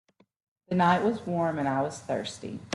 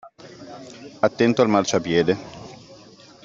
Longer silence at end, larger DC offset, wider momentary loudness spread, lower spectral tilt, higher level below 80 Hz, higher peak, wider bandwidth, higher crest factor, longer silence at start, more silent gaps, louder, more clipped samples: second, 0 s vs 0.5 s; neither; second, 10 LU vs 22 LU; about the same, -6 dB/octave vs -5 dB/octave; second, -68 dBFS vs -60 dBFS; second, -10 dBFS vs -2 dBFS; first, 11.5 kHz vs 7.8 kHz; about the same, 18 dB vs 20 dB; first, 0.7 s vs 0.05 s; neither; second, -28 LUFS vs -20 LUFS; neither